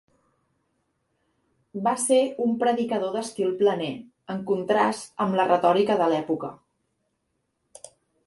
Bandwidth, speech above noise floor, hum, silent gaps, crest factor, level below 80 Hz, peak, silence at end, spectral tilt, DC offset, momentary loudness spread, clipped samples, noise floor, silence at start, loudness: 11.5 kHz; 52 dB; none; none; 20 dB; -70 dBFS; -6 dBFS; 1.7 s; -4.5 dB/octave; under 0.1%; 12 LU; under 0.1%; -76 dBFS; 1.75 s; -24 LUFS